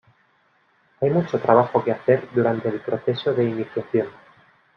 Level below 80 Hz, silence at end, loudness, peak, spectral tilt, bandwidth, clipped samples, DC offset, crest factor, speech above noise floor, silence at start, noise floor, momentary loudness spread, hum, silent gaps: -64 dBFS; 0.65 s; -22 LUFS; -2 dBFS; -9 dB/octave; 6.2 kHz; under 0.1%; under 0.1%; 20 dB; 42 dB; 1 s; -62 dBFS; 8 LU; none; none